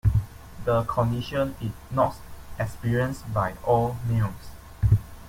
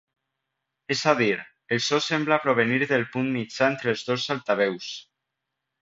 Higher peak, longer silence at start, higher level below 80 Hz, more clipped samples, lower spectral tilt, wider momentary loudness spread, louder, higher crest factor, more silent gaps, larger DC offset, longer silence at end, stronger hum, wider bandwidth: second, -8 dBFS vs -4 dBFS; second, 0.05 s vs 0.9 s; first, -38 dBFS vs -68 dBFS; neither; first, -7.5 dB/octave vs -4.5 dB/octave; first, 13 LU vs 7 LU; about the same, -26 LUFS vs -24 LUFS; about the same, 18 dB vs 22 dB; neither; neither; second, 0 s vs 0.8 s; neither; first, 16.5 kHz vs 7.8 kHz